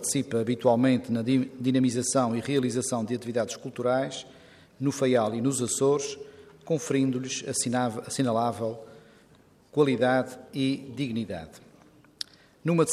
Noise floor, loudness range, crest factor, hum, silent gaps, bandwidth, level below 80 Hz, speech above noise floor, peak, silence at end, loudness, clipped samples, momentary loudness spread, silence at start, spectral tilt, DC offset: -58 dBFS; 4 LU; 20 dB; none; none; 14.5 kHz; -68 dBFS; 32 dB; -8 dBFS; 0 s; -27 LUFS; under 0.1%; 12 LU; 0 s; -5 dB/octave; under 0.1%